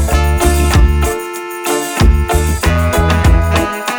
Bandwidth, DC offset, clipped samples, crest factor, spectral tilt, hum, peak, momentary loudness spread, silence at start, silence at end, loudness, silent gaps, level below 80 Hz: over 20 kHz; under 0.1%; under 0.1%; 10 dB; -5 dB/octave; none; -2 dBFS; 6 LU; 0 s; 0 s; -13 LUFS; none; -14 dBFS